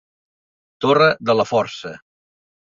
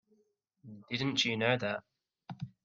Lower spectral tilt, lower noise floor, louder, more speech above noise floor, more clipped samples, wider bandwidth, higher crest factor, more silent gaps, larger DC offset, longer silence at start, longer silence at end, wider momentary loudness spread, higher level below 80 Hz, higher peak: first, -5.5 dB/octave vs -4 dB/octave; first, under -90 dBFS vs -75 dBFS; first, -17 LUFS vs -32 LUFS; first, over 73 dB vs 42 dB; neither; about the same, 7.6 kHz vs 7.8 kHz; about the same, 20 dB vs 24 dB; neither; neither; first, 0.8 s vs 0.65 s; first, 0.75 s vs 0.15 s; second, 16 LU vs 23 LU; first, -62 dBFS vs -74 dBFS; first, -2 dBFS vs -14 dBFS